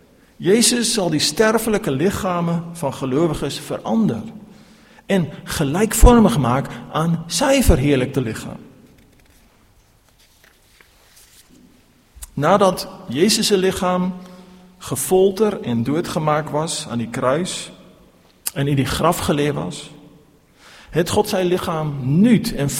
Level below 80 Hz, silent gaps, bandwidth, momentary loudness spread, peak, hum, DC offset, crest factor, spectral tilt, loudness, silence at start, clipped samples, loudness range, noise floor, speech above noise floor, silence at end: -30 dBFS; none; 16.5 kHz; 12 LU; 0 dBFS; none; under 0.1%; 20 dB; -5 dB/octave; -18 LUFS; 0.4 s; under 0.1%; 6 LU; -54 dBFS; 36 dB; 0 s